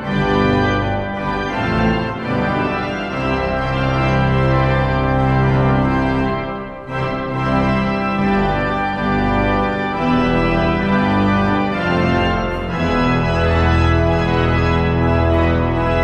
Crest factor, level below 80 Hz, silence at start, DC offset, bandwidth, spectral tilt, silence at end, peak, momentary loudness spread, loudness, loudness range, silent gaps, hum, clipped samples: 14 dB; -28 dBFS; 0 s; under 0.1%; 8.4 kHz; -8 dB/octave; 0 s; -2 dBFS; 6 LU; -17 LUFS; 2 LU; none; none; under 0.1%